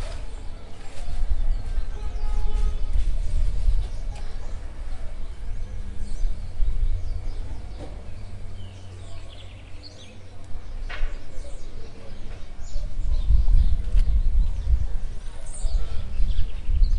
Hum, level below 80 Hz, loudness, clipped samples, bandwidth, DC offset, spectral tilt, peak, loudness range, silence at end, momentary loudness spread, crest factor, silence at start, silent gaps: none; -24 dBFS; -31 LUFS; under 0.1%; 9.4 kHz; under 0.1%; -6 dB/octave; -6 dBFS; 13 LU; 0 s; 17 LU; 16 dB; 0 s; none